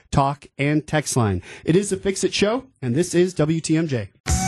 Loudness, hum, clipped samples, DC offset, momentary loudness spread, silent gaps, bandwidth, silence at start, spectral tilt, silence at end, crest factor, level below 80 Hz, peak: -22 LUFS; none; under 0.1%; under 0.1%; 5 LU; 4.20-4.24 s; 12.5 kHz; 0.1 s; -5 dB/octave; 0 s; 14 dB; -38 dBFS; -6 dBFS